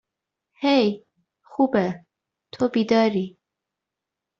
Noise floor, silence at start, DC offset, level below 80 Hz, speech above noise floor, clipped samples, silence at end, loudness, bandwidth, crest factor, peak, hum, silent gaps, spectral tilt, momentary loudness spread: -85 dBFS; 0.6 s; under 0.1%; -66 dBFS; 65 dB; under 0.1%; 1.1 s; -22 LUFS; 7.6 kHz; 18 dB; -8 dBFS; none; none; -4.5 dB/octave; 16 LU